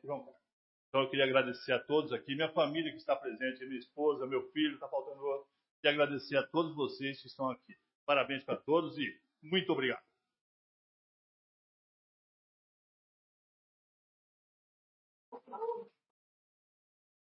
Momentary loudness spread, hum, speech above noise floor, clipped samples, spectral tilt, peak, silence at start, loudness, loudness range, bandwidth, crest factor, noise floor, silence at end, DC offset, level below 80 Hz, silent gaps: 12 LU; none; over 55 dB; under 0.1%; -2.5 dB/octave; -12 dBFS; 0.05 s; -35 LUFS; 15 LU; 5.6 kHz; 24 dB; under -90 dBFS; 1.45 s; under 0.1%; -88 dBFS; 0.53-0.92 s, 5.71-5.83 s, 7.95-8.07 s, 10.41-15.32 s